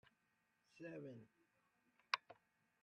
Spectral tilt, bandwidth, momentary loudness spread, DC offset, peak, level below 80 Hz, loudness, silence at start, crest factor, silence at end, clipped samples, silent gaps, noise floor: -3.5 dB/octave; 9.4 kHz; 21 LU; under 0.1%; -18 dBFS; under -90 dBFS; -49 LUFS; 0.75 s; 36 dB; 0.5 s; under 0.1%; none; -84 dBFS